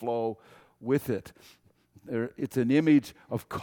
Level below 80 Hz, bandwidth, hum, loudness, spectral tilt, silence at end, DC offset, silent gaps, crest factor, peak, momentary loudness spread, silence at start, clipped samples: -64 dBFS; 18 kHz; none; -28 LUFS; -7.5 dB/octave; 0 s; under 0.1%; none; 18 dB; -12 dBFS; 14 LU; 0 s; under 0.1%